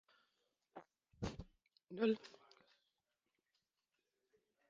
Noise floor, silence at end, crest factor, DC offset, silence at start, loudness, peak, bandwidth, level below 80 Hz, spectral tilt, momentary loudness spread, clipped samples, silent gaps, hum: -90 dBFS; 2.4 s; 26 dB; under 0.1%; 0.75 s; -43 LUFS; -24 dBFS; 7.4 kHz; -68 dBFS; -5.5 dB/octave; 23 LU; under 0.1%; none; none